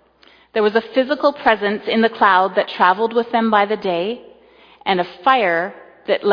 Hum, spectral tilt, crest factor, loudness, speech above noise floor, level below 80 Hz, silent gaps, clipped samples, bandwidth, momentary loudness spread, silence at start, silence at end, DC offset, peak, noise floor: none; -6.5 dB/octave; 18 dB; -17 LUFS; 35 dB; -62 dBFS; none; under 0.1%; 5.2 kHz; 10 LU; 0.55 s; 0 s; under 0.1%; 0 dBFS; -51 dBFS